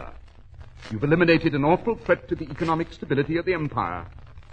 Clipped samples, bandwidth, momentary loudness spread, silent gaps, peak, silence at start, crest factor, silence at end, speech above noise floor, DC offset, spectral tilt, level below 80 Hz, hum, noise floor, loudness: under 0.1%; 8.4 kHz; 17 LU; none; -4 dBFS; 0 s; 20 dB; 0 s; 21 dB; under 0.1%; -8 dB/octave; -46 dBFS; none; -44 dBFS; -24 LUFS